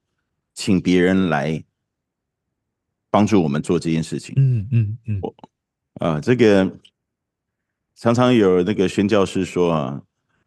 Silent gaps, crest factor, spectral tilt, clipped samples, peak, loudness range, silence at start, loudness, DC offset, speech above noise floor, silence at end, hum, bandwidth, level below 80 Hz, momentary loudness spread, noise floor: none; 18 dB; -7 dB/octave; under 0.1%; -2 dBFS; 3 LU; 0.55 s; -19 LUFS; under 0.1%; 62 dB; 0.45 s; none; 12 kHz; -54 dBFS; 12 LU; -80 dBFS